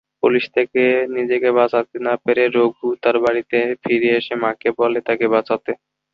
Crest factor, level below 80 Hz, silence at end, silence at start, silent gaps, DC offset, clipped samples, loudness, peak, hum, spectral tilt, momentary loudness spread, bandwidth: 16 dB; -64 dBFS; 0.4 s; 0.25 s; none; under 0.1%; under 0.1%; -18 LUFS; -2 dBFS; none; -7 dB/octave; 5 LU; 5.8 kHz